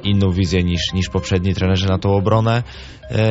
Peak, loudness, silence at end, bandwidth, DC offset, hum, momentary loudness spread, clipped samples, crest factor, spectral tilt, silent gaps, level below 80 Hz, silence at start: -4 dBFS; -18 LUFS; 0 s; 8 kHz; under 0.1%; none; 6 LU; under 0.1%; 14 dB; -5.5 dB/octave; none; -36 dBFS; 0 s